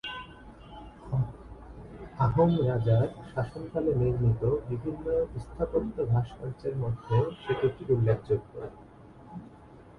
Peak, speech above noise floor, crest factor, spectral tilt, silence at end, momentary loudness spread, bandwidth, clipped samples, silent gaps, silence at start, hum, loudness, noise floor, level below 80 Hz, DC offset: -12 dBFS; 23 dB; 18 dB; -9.5 dB/octave; 0.1 s; 21 LU; 5.2 kHz; under 0.1%; none; 0.05 s; none; -29 LUFS; -51 dBFS; -48 dBFS; under 0.1%